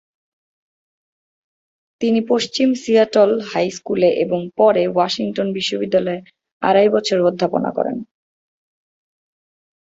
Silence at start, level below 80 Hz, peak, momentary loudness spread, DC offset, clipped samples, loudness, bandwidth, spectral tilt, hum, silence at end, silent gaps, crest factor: 2 s; -62 dBFS; -2 dBFS; 8 LU; under 0.1%; under 0.1%; -17 LUFS; 8 kHz; -5 dB/octave; none; 1.8 s; 6.52-6.60 s; 18 dB